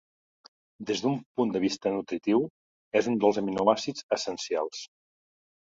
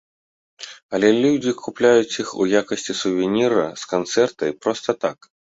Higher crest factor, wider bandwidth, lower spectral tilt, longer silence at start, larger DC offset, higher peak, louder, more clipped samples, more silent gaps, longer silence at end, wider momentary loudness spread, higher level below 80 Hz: about the same, 22 dB vs 18 dB; about the same, 7.8 kHz vs 8 kHz; about the same, -5 dB/octave vs -4.5 dB/octave; first, 0.8 s vs 0.6 s; neither; second, -6 dBFS vs -2 dBFS; second, -28 LUFS vs -20 LUFS; neither; first, 1.26-1.35 s, 2.50-2.91 s, 4.03-4.09 s vs 0.82-0.89 s; first, 0.9 s vs 0.35 s; about the same, 10 LU vs 10 LU; second, -68 dBFS vs -62 dBFS